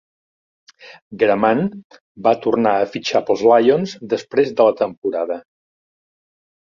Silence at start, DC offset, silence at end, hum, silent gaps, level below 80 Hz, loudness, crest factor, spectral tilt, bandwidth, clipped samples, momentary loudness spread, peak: 0.85 s; under 0.1%; 1.25 s; none; 1.02-1.11 s, 1.84-1.90 s, 2.01-2.15 s, 4.97-5.02 s; -62 dBFS; -17 LUFS; 18 dB; -6 dB/octave; 7.4 kHz; under 0.1%; 10 LU; -2 dBFS